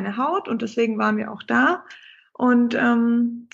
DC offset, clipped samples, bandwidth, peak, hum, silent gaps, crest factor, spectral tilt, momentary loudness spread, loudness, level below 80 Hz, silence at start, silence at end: under 0.1%; under 0.1%; 7.4 kHz; -6 dBFS; none; none; 16 dB; -6 dB/octave; 7 LU; -21 LUFS; -72 dBFS; 0 s; 0.1 s